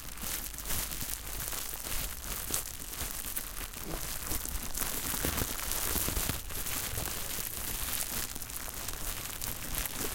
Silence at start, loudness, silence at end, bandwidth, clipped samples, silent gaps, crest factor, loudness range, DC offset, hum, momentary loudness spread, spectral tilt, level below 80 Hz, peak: 0 s; -34 LUFS; 0 s; 17 kHz; under 0.1%; none; 28 dB; 3 LU; under 0.1%; none; 6 LU; -2 dB/octave; -44 dBFS; -8 dBFS